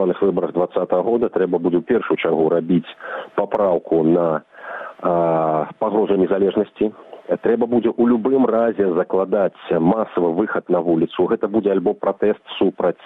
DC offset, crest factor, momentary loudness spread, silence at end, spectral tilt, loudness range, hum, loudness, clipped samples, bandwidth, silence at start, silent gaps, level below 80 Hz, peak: under 0.1%; 14 dB; 6 LU; 0.1 s; -10 dB/octave; 2 LU; none; -19 LUFS; under 0.1%; 4 kHz; 0 s; none; -58 dBFS; -4 dBFS